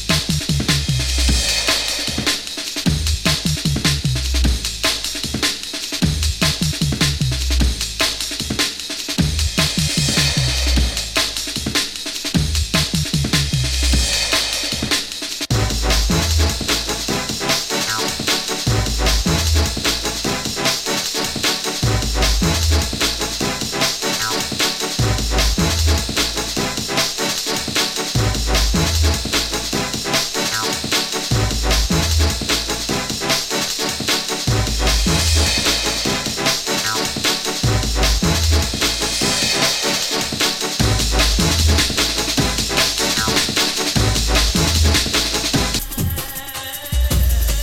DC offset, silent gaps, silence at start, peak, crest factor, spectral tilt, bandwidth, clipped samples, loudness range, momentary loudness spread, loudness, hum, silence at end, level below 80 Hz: under 0.1%; none; 0 s; -2 dBFS; 16 dB; -3 dB/octave; 17 kHz; under 0.1%; 3 LU; 5 LU; -17 LUFS; none; 0 s; -24 dBFS